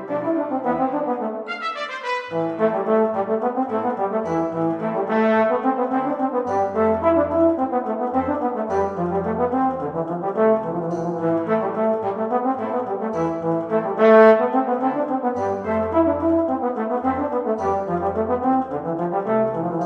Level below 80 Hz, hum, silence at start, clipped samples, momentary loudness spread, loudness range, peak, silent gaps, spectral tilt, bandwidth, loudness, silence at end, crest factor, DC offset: -54 dBFS; none; 0 s; under 0.1%; 7 LU; 4 LU; -2 dBFS; none; -8 dB/octave; 7.4 kHz; -21 LUFS; 0 s; 18 dB; under 0.1%